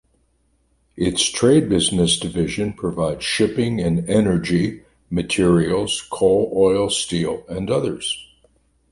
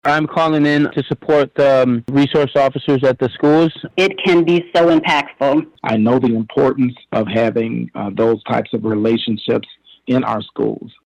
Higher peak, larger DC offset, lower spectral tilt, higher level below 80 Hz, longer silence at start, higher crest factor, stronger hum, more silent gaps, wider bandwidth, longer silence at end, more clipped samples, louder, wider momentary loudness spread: about the same, -4 dBFS vs -6 dBFS; neither; second, -4.5 dB/octave vs -7 dB/octave; first, -42 dBFS vs -52 dBFS; first, 0.95 s vs 0.05 s; first, 16 dB vs 10 dB; neither; neither; first, 11.5 kHz vs 9.6 kHz; first, 0.65 s vs 0.15 s; neither; second, -19 LUFS vs -16 LUFS; about the same, 9 LU vs 8 LU